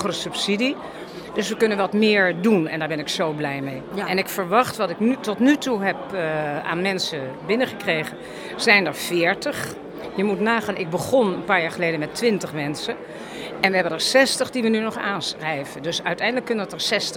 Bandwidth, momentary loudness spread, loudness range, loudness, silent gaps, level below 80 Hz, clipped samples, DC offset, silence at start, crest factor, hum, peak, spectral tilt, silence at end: 18 kHz; 12 LU; 1 LU; -22 LUFS; none; -60 dBFS; under 0.1%; under 0.1%; 0 s; 20 dB; none; -2 dBFS; -4 dB/octave; 0 s